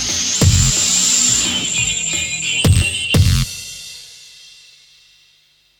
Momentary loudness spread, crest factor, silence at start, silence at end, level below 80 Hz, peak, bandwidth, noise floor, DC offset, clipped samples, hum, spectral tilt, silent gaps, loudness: 16 LU; 16 dB; 0 s; 1.5 s; -30 dBFS; 0 dBFS; 19 kHz; -55 dBFS; under 0.1%; under 0.1%; 50 Hz at -40 dBFS; -2.5 dB/octave; none; -14 LUFS